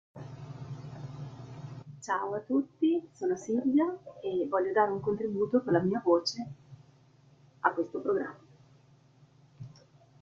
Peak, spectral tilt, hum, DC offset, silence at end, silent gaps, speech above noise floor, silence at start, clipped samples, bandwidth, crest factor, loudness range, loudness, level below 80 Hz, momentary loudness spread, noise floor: -10 dBFS; -6 dB/octave; none; under 0.1%; 0.5 s; none; 31 dB; 0.15 s; under 0.1%; 7.6 kHz; 24 dB; 8 LU; -30 LUFS; -72 dBFS; 18 LU; -61 dBFS